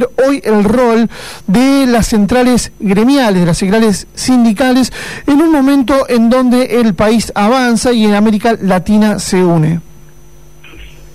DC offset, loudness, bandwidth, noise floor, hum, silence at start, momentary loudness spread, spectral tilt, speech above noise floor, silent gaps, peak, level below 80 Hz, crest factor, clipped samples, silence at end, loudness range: 2%; -10 LUFS; 15.5 kHz; -39 dBFS; none; 0 s; 4 LU; -5.5 dB/octave; 30 dB; none; -4 dBFS; -32 dBFS; 6 dB; under 0.1%; 0.3 s; 1 LU